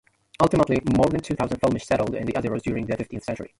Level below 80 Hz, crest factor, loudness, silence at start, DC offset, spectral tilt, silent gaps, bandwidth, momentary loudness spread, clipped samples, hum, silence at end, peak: -44 dBFS; 20 dB; -24 LUFS; 0.4 s; under 0.1%; -7 dB/octave; none; 11.5 kHz; 9 LU; under 0.1%; none; 0.1 s; -4 dBFS